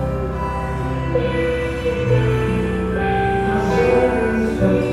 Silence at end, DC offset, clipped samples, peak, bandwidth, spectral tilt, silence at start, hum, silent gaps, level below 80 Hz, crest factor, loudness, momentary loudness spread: 0 s; under 0.1%; under 0.1%; -4 dBFS; 12.5 kHz; -7.5 dB/octave; 0 s; none; none; -30 dBFS; 14 dB; -19 LUFS; 7 LU